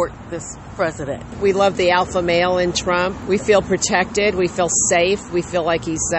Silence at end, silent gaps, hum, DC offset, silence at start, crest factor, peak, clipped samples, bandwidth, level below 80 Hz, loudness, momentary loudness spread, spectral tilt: 0 s; none; none; under 0.1%; 0 s; 16 dB; -2 dBFS; under 0.1%; 8.6 kHz; -40 dBFS; -18 LUFS; 10 LU; -3.5 dB/octave